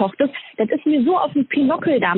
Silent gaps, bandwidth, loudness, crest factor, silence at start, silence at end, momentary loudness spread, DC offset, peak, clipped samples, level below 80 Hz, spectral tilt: none; 4.1 kHz; -19 LUFS; 14 dB; 0 s; 0 s; 5 LU; under 0.1%; -4 dBFS; under 0.1%; -64 dBFS; -4.5 dB/octave